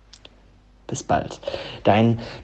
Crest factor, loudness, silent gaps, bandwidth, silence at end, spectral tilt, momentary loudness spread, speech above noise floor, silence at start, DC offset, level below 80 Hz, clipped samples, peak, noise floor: 22 dB; -23 LUFS; none; 8.8 kHz; 0 s; -6 dB/octave; 14 LU; 30 dB; 0.9 s; under 0.1%; -50 dBFS; under 0.1%; -2 dBFS; -52 dBFS